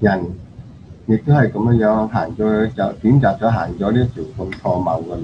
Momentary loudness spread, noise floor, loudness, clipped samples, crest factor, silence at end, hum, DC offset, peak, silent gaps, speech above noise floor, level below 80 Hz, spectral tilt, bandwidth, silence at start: 11 LU; -37 dBFS; -17 LUFS; under 0.1%; 16 dB; 0 s; none; 0.1%; 0 dBFS; none; 21 dB; -40 dBFS; -9.5 dB/octave; 6.6 kHz; 0 s